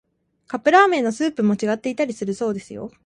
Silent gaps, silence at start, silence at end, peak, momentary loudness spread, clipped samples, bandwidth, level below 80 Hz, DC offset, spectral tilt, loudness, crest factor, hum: none; 0.5 s; 0.15 s; -2 dBFS; 14 LU; under 0.1%; 10.5 kHz; -64 dBFS; under 0.1%; -5.5 dB/octave; -20 LUFS; 20 dB; none